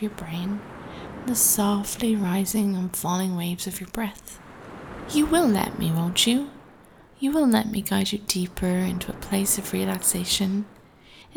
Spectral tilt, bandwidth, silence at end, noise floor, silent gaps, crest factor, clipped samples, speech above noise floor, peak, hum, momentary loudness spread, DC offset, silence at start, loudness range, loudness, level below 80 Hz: -4 dB/octave; over 20 kHz; 0.15 s; -51 dBFS; none; 20 dB; under 0.1%; 27 dB; -6 dBFS; none; 18 LU; under 0.1%; 0 s; 3 LU; -24 LUFS; -48 dBFS